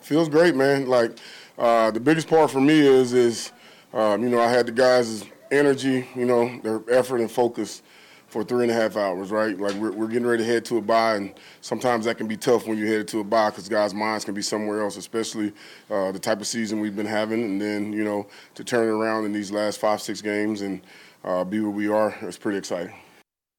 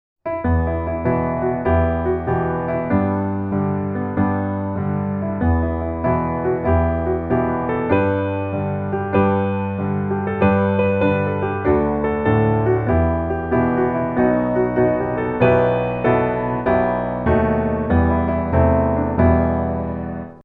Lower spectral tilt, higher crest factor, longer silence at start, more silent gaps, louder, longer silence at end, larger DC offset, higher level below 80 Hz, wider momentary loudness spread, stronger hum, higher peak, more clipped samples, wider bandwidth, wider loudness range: second, -5 dB/octave vs -11.5 dB/octave; about the same, 14 dB vs 16 dB; second, 0.05 s vs 0.25 s; neither; second, -23 LUFS vs -19 LUFS; first, 0.6 s vs 0.05 s; neither; second, -70 dBFS vs -32 dBFS; first, 12 LU vs 6 LU; neither; second, -10 dBFS vs -2 dBFS; neither; first, 18 kHz vs 4.1 kHz; first, 7 LU vs 3 LU